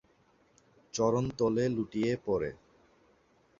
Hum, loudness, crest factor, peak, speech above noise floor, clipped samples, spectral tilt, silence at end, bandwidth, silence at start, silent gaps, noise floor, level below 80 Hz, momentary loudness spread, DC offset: none; -31 LUFS; 18 dB; -14 dBFS; 37 dB; under 0.1%; -6 dB/octave; 1.05 s; 7.6 kHz; 0.95 s; none; -67 dBFS; -60 dBFS; 6 LU; under 0.1%